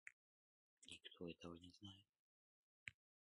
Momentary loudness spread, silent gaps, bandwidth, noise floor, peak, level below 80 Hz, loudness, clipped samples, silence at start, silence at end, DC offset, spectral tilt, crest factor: 9 LU; 0.13-0.77 s, 2.09-2.13 s, 2.19-2.86 s; 11 kHz; under -90 dBFS; -32 dBFS; -80 dBFS; -60 LUFS; under 0.1%; 0.05 s; 0.35 s; under 0.1%; -4 dB/octave; 30 dB